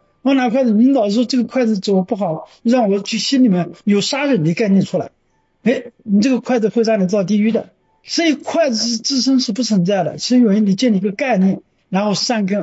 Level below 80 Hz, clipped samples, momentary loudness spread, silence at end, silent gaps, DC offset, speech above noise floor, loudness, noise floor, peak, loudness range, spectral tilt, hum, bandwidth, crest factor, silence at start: -66 dBFS; under 0.1%; 7 LU; 0 s; none; under 0.1%; 34 dB; -16 LUFS; -49 dBFS; -4 dBFS; 2 LU; -5.5 dB/octave; none; 8 kHz; 12 dB; 0.25 s